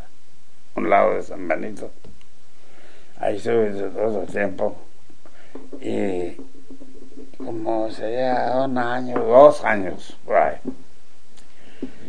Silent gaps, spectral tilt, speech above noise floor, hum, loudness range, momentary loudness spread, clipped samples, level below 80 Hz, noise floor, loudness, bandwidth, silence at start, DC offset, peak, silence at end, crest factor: none; -6.5 dB/octave; 37 dB; none; 10 LU; 19 LU; under 0.1%; -56 dBFS; -58 dBFS; -21 LUFS; 10 kHz; 0.75 s; 6%; 0 dBFS; 0 s; 24 dB